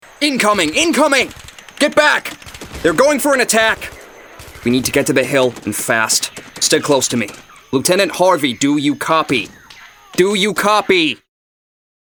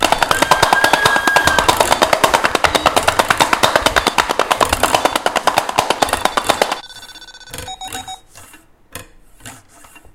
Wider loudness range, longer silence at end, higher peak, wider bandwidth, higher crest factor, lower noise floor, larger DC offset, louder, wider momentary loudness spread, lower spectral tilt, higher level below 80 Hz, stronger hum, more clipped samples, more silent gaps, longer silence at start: second, 2 LU vs 12 LU; first, 0.9 s vs 0.15 s; about the same, 0 dBFS vs 0 dBFS; about the same, over 20 kHz vs over 20 kHz; about the same, 16 dB vs 16 dB; about the same, -41 dBFS vs -44 dBFS; neither; about the same, -14 LUFS vs -14 LUFS; second, 11 LU vs 21 LU; about the same, -3 dB/octave vs -2 dB/octave; second, -48 dBFS vs -38 dBFS; neither; second, under 0.1% vs 0.1%; neither; first, 0.2 s vs 0 s